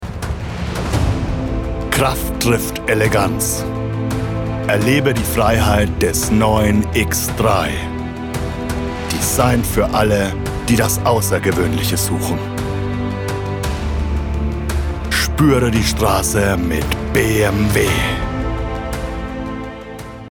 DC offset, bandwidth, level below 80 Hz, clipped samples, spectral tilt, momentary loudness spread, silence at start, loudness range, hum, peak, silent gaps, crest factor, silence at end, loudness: under 0.1%; 19.5 kHz; -26 dBFS; under 0.1%; -5 dB/octave; 9 LU; 0 s; 3 LU; none; -2 dBFS; none; 14 dB; 0 s; -17 LUFS